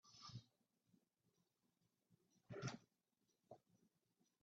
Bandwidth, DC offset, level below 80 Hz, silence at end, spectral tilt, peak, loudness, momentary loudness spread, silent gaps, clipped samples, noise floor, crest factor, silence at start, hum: 7.2 kHz; under 0.1%; -88 dBFS; 0.65 s; -5 dB/octave; -36 dBFS; -56 LUFS; 16 LU; none; under 0.1%; -89 dBFS; 26 dB; 0.05 s; none